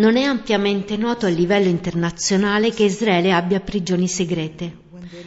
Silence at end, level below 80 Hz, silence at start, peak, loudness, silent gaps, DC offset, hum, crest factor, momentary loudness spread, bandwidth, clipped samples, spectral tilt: 0 s; -48 dBFS; 0 s; -4 dBFS; -19 LUFS; none; under 0.1%; none; 16 dB; 9 LU; 8 kHz; under 0.1%; -4.5 dB/octave